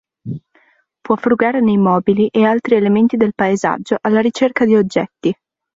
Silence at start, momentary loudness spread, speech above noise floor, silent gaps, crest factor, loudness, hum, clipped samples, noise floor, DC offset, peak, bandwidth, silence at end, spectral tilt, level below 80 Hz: 0.25 s; 9 LU; 42 dB; none; 14 dB; -15 LUFS; none; under 0.1%; -56 dBFS; under 0.1%; -2 dBFS; 7.8 kHz; 0.4 s; -7 dB/octave; -56 dBFS